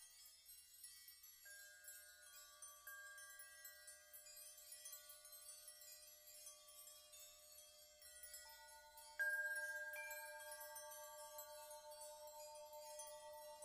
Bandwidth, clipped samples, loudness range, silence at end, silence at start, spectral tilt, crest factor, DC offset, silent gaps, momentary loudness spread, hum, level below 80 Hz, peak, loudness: 15 kHz; under 0.1%; 10 LU; 0 s; 0 s; 2 dB/octave; 22 dB; under 0.1%; none; 13 LU; none; -88 dBFS; -34 dBFS; -54 LUFS